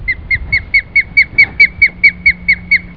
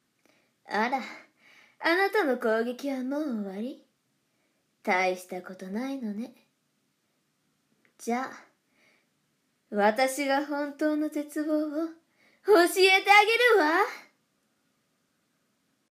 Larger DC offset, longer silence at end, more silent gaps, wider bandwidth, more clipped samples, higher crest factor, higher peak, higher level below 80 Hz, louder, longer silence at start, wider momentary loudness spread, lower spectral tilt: first, 0.7% vs under 0.1%; second, 0 s vs 1.9 s; neither; second, 5.4 kHz vs 15.5 kHz; first, 1% vs under 0.1%; second, 12 dB vs 22 dB; first, 0 dBFS vs -6 dBFS; first, -30 dBFS vs -90 dBFS; first, -9 LUFS vs -26 LUFS; second, 0 s vs 0.7 s; second, 6 LU vs 18 LU; about the same, -4 dB/octave vs -3 dB/octave